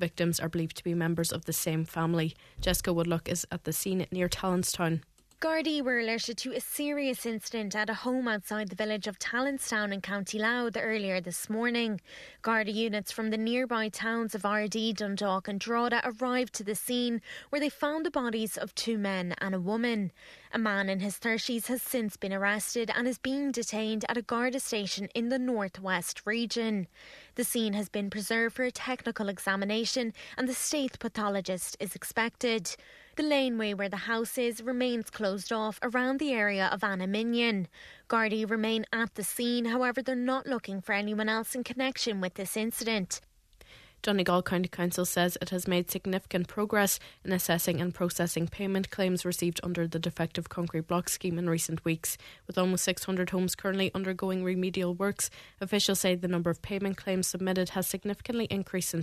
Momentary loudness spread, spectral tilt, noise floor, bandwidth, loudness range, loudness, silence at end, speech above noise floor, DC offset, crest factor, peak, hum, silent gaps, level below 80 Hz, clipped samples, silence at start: 6 LU; -4 dB/octave; -57 dBFS; 14 kHz; 2 LU; -31 LUFS; 0 s; 26 dB; under 0.1%; 22 dB; -10 dBFS; none; none; -58 dBFS; under 0.1%; 0 s